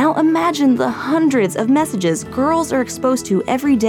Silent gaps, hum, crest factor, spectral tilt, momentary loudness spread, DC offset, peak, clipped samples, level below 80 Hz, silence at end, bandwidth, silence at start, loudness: none; none; 12 dB; -5 dB/octave; 4 LU; under 0.1%; -4 dBFS; under 0.1%; -50 dBFS; 0 s; 16.5 kHz; 0 s; -17 LUFS